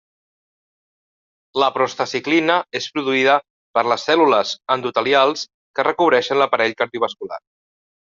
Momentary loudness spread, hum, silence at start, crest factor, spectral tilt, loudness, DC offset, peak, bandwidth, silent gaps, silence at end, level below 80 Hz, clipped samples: 9 LU; none; 1.55 s; 20 dB; -3.5 dB/octave; -18 LUFS; under 0.1%; 0 dBFS; 7.6 kHz; 3.50-3.74 s, 5.54-5.74 s; 0.75 s; -66 dBFS; under 0.1%